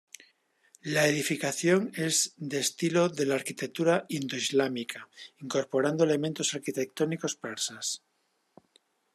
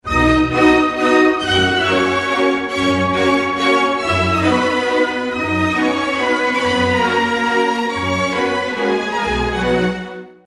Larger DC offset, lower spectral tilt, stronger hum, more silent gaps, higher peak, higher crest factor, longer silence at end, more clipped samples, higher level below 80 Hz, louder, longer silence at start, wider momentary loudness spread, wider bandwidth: neither; second, -3.5 dB/octave vs -5 dB/octave; neither; neither; second, -12 dBFS vs -2 dBFS; about the same, 18 dB vs 14 dB; first, 1.15 s vs 0.15 s; neither; second, -76 dBFS vs -36 dBFS; second, -29 LUFS vs -16 LUFS; first, 0.85 s vs 0.05 s; first, 9 LU vs 5 LU; first, 14 kHz vs 11.5 kHz